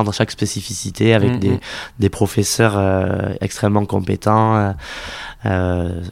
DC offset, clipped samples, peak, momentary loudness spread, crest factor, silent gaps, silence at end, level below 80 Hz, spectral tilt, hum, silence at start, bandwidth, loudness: under 0.1%; under 0.1%; 0 dBFS; 11 LU; 18 dB; none; 0 s; -40 dBFS; -5.5 dB/octave; none; 0 s; 15.5 kHz; -18 LUFS